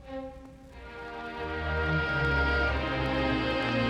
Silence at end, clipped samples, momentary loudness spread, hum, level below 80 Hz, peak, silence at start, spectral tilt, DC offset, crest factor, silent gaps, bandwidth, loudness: 0 s; under 0.1%; 19 LU; none; -38 dBFS; -14 dBFS; 0 s; -6.5 dB/octave; under 0.1%; 14 dB; none; 9.4 kHz; -29 LUFS